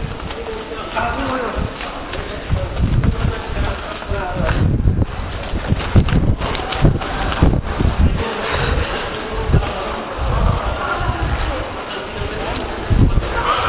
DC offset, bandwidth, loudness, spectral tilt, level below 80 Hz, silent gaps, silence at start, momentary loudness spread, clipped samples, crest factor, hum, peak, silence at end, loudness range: under 0.1%; 4 kHz; -20 LUFS; -10.5 dB/octave; -22 dBFS; none; 0 s; 9 LU; under 0.1%; 18 dB; none; 0 dBFS; 0 s; 4 LU